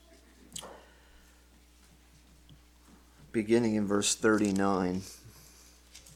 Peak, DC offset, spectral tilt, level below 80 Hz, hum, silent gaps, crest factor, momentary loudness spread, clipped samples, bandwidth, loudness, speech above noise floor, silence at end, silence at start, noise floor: -12 dBFS; under 0.1%; -4.5 dB/octave; -60 dBFS; none; none; 20 dB; 24 LU; under 0.1%; 16.5 kHz; -29 LUFS; 31 dB; 0.15 s; 0.55 s; -60 dBFS